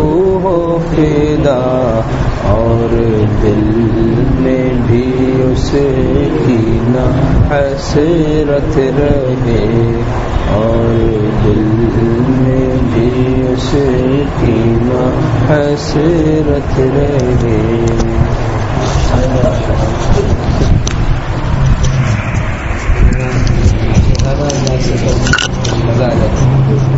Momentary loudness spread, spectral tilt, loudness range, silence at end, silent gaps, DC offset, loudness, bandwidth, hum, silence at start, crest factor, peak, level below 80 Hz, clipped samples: 3 LU; -7 dB/octave; 2 LU; 0 s; none; under 0.1%; -12 LUFS; 8 kHz; none; 0 s; 10 dB; 0 dBFS; -18 dBFS; under 0.1%